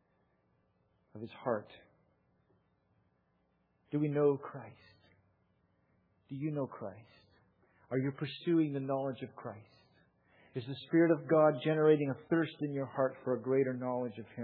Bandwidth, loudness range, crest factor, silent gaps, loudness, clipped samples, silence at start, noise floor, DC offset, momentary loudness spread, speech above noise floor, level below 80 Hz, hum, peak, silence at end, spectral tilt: 4.8 kHz; 15 LU; 20 dB; none; -33 LUFS; under 0.1%; 1.15 s; -76 dBFS; under 0.1%; 19 LU; 43 dB; -82 dBFS; none; -16 dBFS; 0 s; -6.5 dB/octave